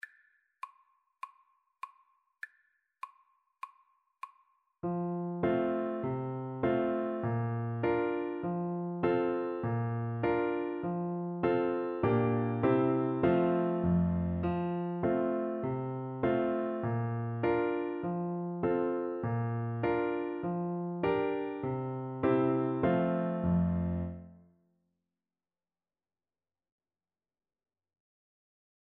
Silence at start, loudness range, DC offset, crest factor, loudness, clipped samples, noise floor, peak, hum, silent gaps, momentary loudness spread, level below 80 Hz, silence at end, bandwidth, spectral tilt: 0.65 s; 14 LU; under 0.1%; 18 dB; -32 LUFS; under 0.1%; under -90 dBFS; -16 dBFS; none; none; 20 LU; -58 dBFS; 4.55 s; 4.4 kHz; -8 dB/octave